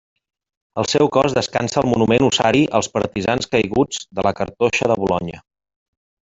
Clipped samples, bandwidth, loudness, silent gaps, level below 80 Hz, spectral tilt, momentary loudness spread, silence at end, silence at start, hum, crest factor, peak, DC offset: under 0.1%; 8.2 kHz; -18 LUFS; none; -48 dBFS; -4.5 dB/octave; 7 LU; 1 s; 0.75 s; none; 18 dB; -2 dBFS; under 0.1%